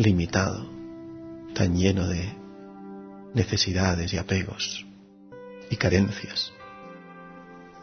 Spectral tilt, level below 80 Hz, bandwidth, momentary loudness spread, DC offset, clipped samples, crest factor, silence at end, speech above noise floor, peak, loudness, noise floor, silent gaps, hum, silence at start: -5 dB/octave; -46 dBFS; 6.6 kHz; 22 LU; under 0.1%; under 0.1%; 22 dB; 0 s; 23 dB; -6 dBFS; -26 LUFS; -48 dBFS; none; none; 0 s